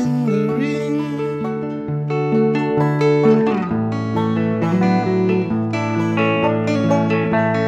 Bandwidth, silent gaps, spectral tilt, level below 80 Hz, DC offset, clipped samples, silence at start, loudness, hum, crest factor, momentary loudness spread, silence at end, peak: 8.4 kHz; none; -8 dB/octave; -56 dBFS; under 0.1%; under 0.1%; 0 s; -18 LUFS; none; 14 dB; 7 LU; 0 s; -4 dBFS